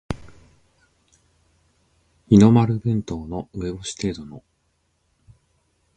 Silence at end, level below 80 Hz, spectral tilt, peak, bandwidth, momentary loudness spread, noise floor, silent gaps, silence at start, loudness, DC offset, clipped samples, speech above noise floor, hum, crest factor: 1.6 s; -46 dBFS; -7.5 dB/octave; -2 dBFS; 9.2 kHz; 21 LU; -69 dBFS; none; 0.1 s; -20 LUFS; under 0.1%; under 0.1%; 49 dB; none; 22 dB